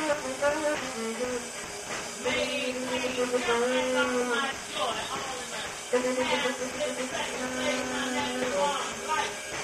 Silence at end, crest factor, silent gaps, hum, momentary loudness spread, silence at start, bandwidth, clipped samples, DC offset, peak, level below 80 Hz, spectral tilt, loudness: 0 s; 16 dB; none; none; 7 LU; 0 s; 16 kHz; under 0.1%; under 0.1%; -14 dBFS; -60 dBFS; -2 dB/octave; -29 LUFS